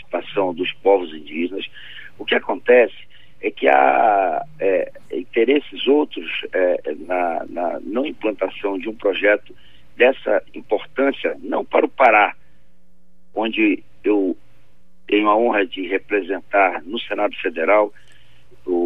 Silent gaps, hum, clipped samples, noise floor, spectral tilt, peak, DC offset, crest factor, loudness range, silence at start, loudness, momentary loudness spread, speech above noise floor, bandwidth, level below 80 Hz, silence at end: none; none; under 0.1%; -59 dBFS; -6 dB/octave; -2 dBFS; 1%; 18 dB; 4 LU; 0.15 s; -19 LUFS; 11 LU; 40 dB; 4.1 kHz; -62 dBFS; 0 s